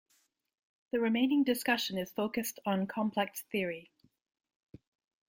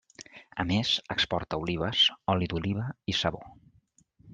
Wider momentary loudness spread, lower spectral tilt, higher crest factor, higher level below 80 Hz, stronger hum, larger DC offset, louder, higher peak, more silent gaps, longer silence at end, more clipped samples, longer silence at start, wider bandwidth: second, 7 LU vs 15 LU; about the same, -4.5 dB/octave vs -4.5 dB/octave; about the same, 20 dB vs 20 dB; second, -76 dBFS vs -54 dBFS; neither; neither; second, -33 LUFS vs -28 LUFS; second, -14 dBFS vs -10 dBFS; neither; first, 1.45 s vs 0 s; neither; first, 0.95 s vs 0.2 s; first, 16.5 kHz vs 9.4 kHz